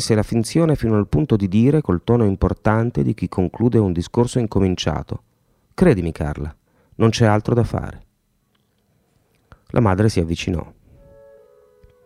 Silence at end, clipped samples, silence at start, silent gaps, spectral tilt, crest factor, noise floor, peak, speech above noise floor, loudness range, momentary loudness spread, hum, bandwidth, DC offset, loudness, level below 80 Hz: 1.35 s; under 0.1%; 0 s; none; -7 dB/octave; 18 dB; -65 dBFS; 0 dBFS; 47 dB; 6 LU; 11 LU; none; 13 kHz; under 0.1%; -19 LUFS; -38 dBFS